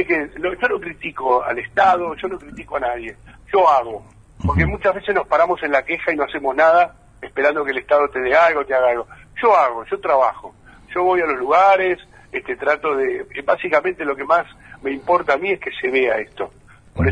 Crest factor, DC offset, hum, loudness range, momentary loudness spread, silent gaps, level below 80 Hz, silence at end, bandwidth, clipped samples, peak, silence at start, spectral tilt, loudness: 16 dB; under 0.1%; none; 3 LU; 14 LU; none; -40 dBFS; 0 s; 10 kHz; under 0.1%; -2 dBFS; 0 s; -7 dB/octave; -18 LUFS